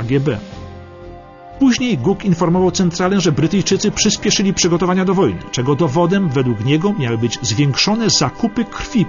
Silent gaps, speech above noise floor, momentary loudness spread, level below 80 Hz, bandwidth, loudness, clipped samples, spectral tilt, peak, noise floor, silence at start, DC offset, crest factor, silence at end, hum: none; 20 dB; 7 LU; -40 dBFS; 7.4 kHz; -16 LUFS; under 0.1%; -5 dB/octave; -2 dBFS; -36 dBFS; 0 s; under 0.1%; 14 dB; 0 s; none